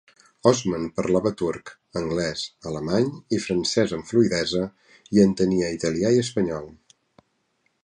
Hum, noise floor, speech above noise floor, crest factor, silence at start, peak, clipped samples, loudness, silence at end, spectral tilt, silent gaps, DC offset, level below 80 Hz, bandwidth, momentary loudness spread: none; -70 dBFS; 48 dB; 20 dB; 0.45 s; -4 dBFS; under 0.1%; -24 LUFS; 1.15 s; -5.5 dB/octave; none; under 0.1%; -52 dBFS; 11 kHz; 11 LU